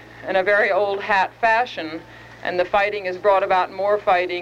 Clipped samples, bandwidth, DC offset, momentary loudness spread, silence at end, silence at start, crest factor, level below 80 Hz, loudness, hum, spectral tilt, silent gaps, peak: under 0.1%; 8.6 kHz; under 0.1%; 9 LU; 0 s; 0 s; 16 dB; -54 dBFS; -20 LUFS; none; -4.5 dB/octave; none; -6 dBFS